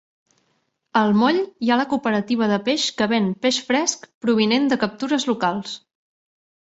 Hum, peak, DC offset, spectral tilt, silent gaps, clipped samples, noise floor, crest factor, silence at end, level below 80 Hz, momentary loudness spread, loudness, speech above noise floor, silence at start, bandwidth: none; -4 dBFS; under 0.1%; -4 dB/octave; 4.14-4.21 s; under 0.1%; -69 dBFS; 16 dB; 0.9 s; -64 dBFS; 6 LU; -20 LUFS; 49 dB; 0.95 s; 8 kHz